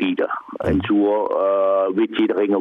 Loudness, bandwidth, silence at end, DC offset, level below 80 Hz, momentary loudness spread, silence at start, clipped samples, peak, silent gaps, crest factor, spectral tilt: -19 LUFS; 4 kHz; 0 s; under 0.1%; -44 dBFS; 5 LU; 0 s; under 0.1%; -10 dBFS; none; 10 dB; -8.5 dB/octave